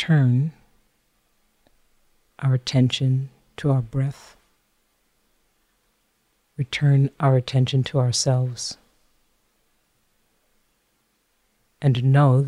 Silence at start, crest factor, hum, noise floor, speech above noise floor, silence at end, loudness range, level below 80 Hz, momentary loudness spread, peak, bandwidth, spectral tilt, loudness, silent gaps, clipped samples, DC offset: 0 s; 18 dB; none; -68 dBFS; 49 dB; 0 s; 8 LU; -58 dBFS; 13 LU; -6 dBFS; 11 kHz; -6 dB/octave; -22 LUFS; none; under 0.1%; under 0.1%